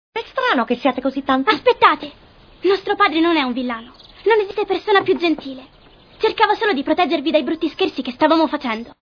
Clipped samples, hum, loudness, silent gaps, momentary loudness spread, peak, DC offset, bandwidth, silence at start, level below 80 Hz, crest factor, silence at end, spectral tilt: under 0.1%; none; -18 LUFS; none; 9 LU; 0 dBFS; under 0.1%; 5.4 kHz; 0.15 s; -54 dBFS; 18 dB; 0.1 s; -5 dB/octave